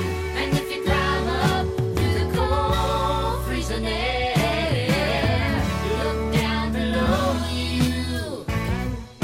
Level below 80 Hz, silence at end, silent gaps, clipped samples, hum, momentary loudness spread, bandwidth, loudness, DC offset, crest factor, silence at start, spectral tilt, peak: -32 dBFS; 0 s; none; under 0.1%; none; 5 LU; 16.5 kHz; -23 LUFS; under 0.1%; 18 dB; 0 s; -5.5 dB/octave; -6 dBFS